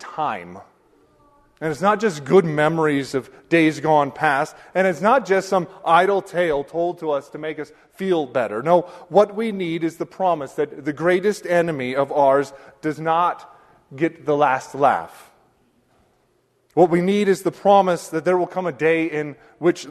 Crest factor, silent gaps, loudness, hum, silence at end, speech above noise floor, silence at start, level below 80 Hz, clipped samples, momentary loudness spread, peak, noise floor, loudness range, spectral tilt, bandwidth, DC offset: 18 dB; none; -20 LUFS; none; 0 s; 44 dB; 0 s; -62 dBFS; under 0.1%; 11 LU; -2 dBFS; -64 dBFS; 3 LU; -6 dB/octave; 13.5 kHz; under 0.1%